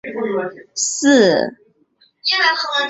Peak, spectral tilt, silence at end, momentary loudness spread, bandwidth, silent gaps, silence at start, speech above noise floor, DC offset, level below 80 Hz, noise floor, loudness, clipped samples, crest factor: -2 dBFS; -2.5 dB/octave; 0 s; 12 LU; 8.2 kHz; none; 0.05 s; 41 dB; under 0.1%; -62 dBFS; -58 dBFS; -16 LUFS; under 0.1%; 16 dB